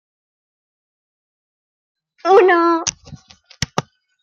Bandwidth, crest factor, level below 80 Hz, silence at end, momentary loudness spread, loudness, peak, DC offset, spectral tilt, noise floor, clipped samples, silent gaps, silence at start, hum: 9.8 kHz; 18 dB; -52 dBFS; 0.4 s; 15 LU; -16 LUFS; -2 dBFS; under 0.1%; -4 dB/octave; -42 dBFS; under 0.1%; none; 2.25 s; none